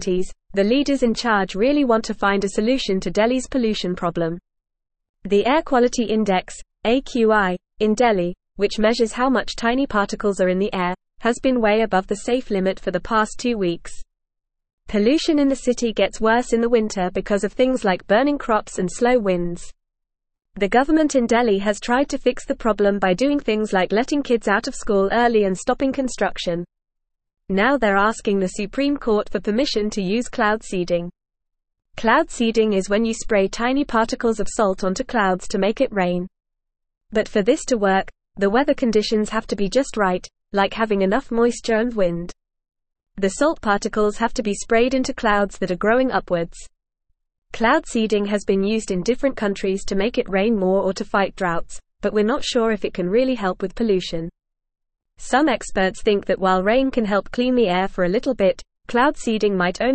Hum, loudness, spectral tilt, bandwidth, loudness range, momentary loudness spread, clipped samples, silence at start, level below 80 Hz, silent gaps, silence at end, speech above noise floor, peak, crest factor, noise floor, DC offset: none; -20 LUFS; -5 dB/octave; 8.8 kHz; 3 LU; 7 LU; under 0.1%; 0 s; -42 dBFS; 5.09-5.14 s, 14.73-14.78 s, 47.38-47.42 s; 0 s; 51 dB; -4 dBFS; 16 dB; -70 dBFS; 0.4%